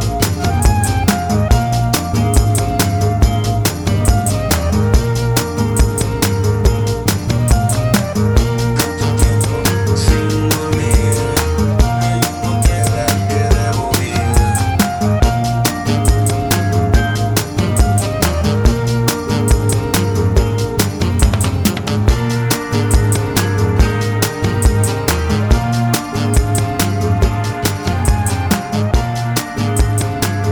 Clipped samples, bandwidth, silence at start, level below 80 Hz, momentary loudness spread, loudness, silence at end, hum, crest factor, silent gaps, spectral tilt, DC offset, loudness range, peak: under 0.1%; over 20 kHz; 0 s; -20 dBFS; 3 LU; -15 LUFS; 0 s; none; 12 dB; none; -5 dB/octave; under 0.1%; 1 LU; 0 dBFS